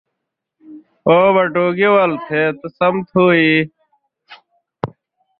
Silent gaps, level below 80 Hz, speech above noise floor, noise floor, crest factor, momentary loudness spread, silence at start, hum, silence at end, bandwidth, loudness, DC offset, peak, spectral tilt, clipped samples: none; -58 dBFS; 64 dB; -78 dBFS; 16 dB; 16 LU; 0.7 s; none; 0.55 s; 5.4 kHz; -14 LUFS; under 0.1%; -2 dBFS; -10 dB/octave; under 0.1%